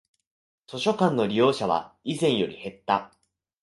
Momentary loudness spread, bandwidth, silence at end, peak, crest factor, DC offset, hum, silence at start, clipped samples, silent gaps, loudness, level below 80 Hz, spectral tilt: 10 LU; 11.5 kHz; 0.55 s; -6 dBFS; 20 dB; under 0.1%; none; 0.7 s; under 0.1%; none; -25 LUFS; -64 dBFS; -5.5 dB/octave